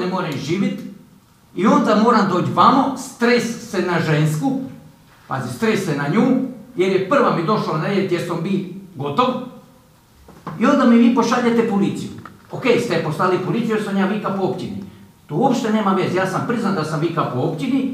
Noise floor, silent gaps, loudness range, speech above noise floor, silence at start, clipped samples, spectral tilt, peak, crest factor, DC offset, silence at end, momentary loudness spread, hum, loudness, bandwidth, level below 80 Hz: -50 dBFS; none; 4 LU; 32 dB; 0 s; under 0.1%; -6.5 dB/octave; 0 dBFS; 18 dB; under 0.1%; 0 s; 14 LU; none; -18 LUFS; 15 kHz; -60 dBFS